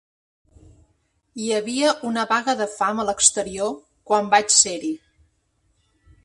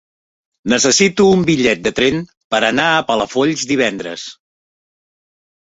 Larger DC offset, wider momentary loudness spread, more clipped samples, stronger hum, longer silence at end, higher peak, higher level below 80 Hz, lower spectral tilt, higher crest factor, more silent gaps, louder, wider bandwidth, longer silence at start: neither; about the same, 15 LU vs 14 LU; neither; neither; about the same, 1.25 s vs 1.35 s; about the same, 0 dBFS vs -2 dBFS; second, -58 dBFS vs -50 dBFS; second, -1 dB/octave vs -3.5 dB/octave; first, 22 dB vs 16 dB; second, none vs 2.37-2.50 s; second, -20 LUFS vs -14 LUFS; first, 11.5 kHz vs 8 kHz; first, 1.35 s vs 0.65 s